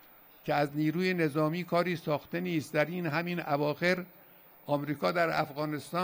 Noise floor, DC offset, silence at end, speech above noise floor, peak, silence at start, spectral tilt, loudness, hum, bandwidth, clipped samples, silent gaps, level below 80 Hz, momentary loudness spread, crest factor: -57 dBFS; under 0.1%; 0 s; 26 dB; -14 dBFS; 0.45 s; -6.5 dB/octave; -31 LUFS; none; 16.5 kHz; under 0.1%; none; -72 dBFS; 5 LU; 18 dB